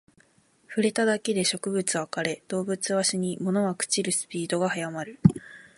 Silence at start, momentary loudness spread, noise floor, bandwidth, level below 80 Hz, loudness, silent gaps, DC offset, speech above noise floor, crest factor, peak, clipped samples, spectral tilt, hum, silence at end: 0.7 s; 7 LU; -63 dBFS; 11.5 kHz; -58 dBFS; -26 LUFS; none; under 0.1%; 36 dB; 24 dB; -2 dBFS; under 0.1%; -4 dB/octave; none; 0.15 s